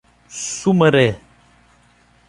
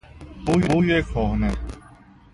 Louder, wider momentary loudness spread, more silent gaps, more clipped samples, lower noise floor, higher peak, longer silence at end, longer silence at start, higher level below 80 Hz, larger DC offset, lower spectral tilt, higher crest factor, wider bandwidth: first, -17 LUFS vs -22 LUFS; about the same, 21 LU vs 20 LU; neither; neither; first, -54 dBFS vs -49 dBFS; first, -2 dBFS vs -6 dBFS; first, 1.1 s vs 0.55 s; first, 0.3 s vs 0.15 s; second, -52 dBFS vs -32 dBFS; neither; second, -5 dB/octave vs -7 dB/octave; about the same, 18 dB vs 16 dB; about the same, 11.5 kHz vs 11.5 kHz